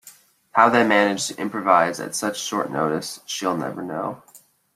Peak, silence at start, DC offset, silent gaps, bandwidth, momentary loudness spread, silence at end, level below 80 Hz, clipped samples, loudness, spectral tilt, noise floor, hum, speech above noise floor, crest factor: -2 dBFS; 0.05 s; under 0.1%; none; 16 kHz; 12 LU; 0.4 s; -66 dBFS; under 0.1%; -21 LUFS; -3.5 dB/octave; -50 dBFS; none; 29 dB; 22 dB